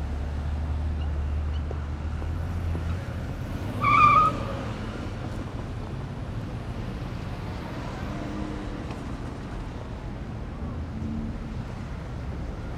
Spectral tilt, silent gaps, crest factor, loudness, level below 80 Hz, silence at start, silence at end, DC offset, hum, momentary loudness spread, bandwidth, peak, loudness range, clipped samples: -7 dB/octave; none; 22 dB; -29 LUFS; -34 dBFS; 0 s; 0 s; under 0.1%; none; 11 LU; 11.5 kHz; -6 dBFS; 10 LU; under 0.1%